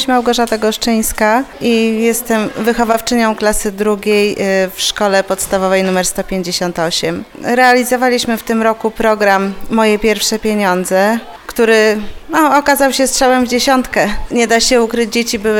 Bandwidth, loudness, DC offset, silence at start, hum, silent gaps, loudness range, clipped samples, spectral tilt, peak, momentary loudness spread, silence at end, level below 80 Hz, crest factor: 18.5 kHz; -13 LUFS; under 0.1%; 0 s; none; none; 2 LU; under 0.1%; -3.5 dB/octave; 0 dBFS; 6 LU; 0 s; -34 dBFS; 12 dB